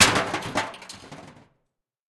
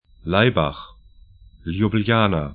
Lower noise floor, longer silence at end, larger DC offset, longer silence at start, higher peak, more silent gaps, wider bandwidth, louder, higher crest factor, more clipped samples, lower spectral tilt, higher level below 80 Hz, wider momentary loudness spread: first, -77 dBFS vs -48 dBFS; first, 0.8 s vs 0 s; neither; second, 0 s vs 0.25 s; about the same, -2 dBFS vs 0 dBFS; neither; first, 12.5 kHz vs 4.7 kHz; second, -24 LUFS vs -20 LUFS; about the same, 24 dB vs 20 dB; neither; second, -1.5 dB/octave vs -11.5 dB/octave; second, -54 dBFS vs -42 dBFS; first, 22 LU vs 15 LU